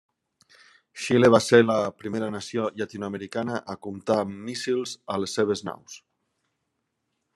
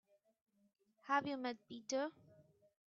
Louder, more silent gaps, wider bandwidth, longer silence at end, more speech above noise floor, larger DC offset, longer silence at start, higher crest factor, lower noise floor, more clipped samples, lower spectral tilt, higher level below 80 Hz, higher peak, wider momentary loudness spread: first, -25 LUFS vs -42 LUFS; neither; first, 12.5 kHz vs 7.4 kHz; first, 1.4 s vs 0.45 s; first, 54 dB vs 28 dB; neither; about the same, 0.95 s vs 1.05 s; about the same, 24 dB vs 22 dB; first, -78 dBFS vs -69 dBFS; neither; first, -5 dB/octave vs -2 dB/octave; first, -70 dBFS vs -88 dBFS; first, -2 dBFS vs -22 dBFS; first, 18 LU vs 11 LU